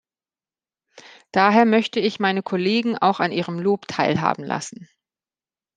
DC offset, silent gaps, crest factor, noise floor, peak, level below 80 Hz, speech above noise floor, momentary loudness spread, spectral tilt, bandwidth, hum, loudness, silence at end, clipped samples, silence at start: under 0.1%; none; 20 dB; under -90 dBFS; -2 dBFS; -68 dBFS; over 70 dB; 10 LU; -5.5 dB/octave; 9.6 kHz; none; -20 LUFS; 0.9 s; under 0.1%; 1.35 s